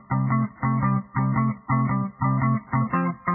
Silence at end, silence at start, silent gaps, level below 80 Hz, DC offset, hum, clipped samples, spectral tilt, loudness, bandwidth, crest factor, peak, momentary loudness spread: 0 s; 0.1 s; none; -52 dBFS; under 0.1%; none; under 0.1%; -15.5 dB/octave; -24 LUFS; 2.8 kHz; 12 dB; -10 dBFS; 2 LU